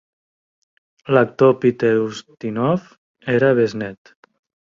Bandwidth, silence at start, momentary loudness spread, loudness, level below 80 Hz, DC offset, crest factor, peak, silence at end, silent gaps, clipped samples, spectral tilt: 7.4 kHz; 1.05 s; 15 LU; -18 LUFS; -60 dBFS; under 0.1%; 18 dB; -2 dBFS; 0.7 s; 2.98-3.14 s; under 0.1%; -7.5 dB/octave